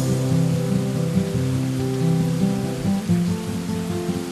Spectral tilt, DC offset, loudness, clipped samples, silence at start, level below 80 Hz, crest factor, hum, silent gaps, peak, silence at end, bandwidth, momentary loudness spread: -7 dB/octave; under 0.1%; -22 LUFS; under 0.1%; 0 s; -46 dBFS; 14 dB; none; none; -8 dBFS; 0 s; 13.5 kHz; 5 LU